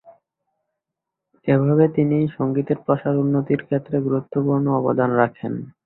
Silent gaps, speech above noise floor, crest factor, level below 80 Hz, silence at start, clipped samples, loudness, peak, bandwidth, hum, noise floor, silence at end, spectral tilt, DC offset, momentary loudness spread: none; 64 dB; 18 dB; -60 dBFS; 1.45 s; under 0.1%; -20 LUFS; -2 dBFS; 4.1 kHz; none; -84 dBFS; 0.15 s; -13 dB/octave; under 0.1%; 6 LU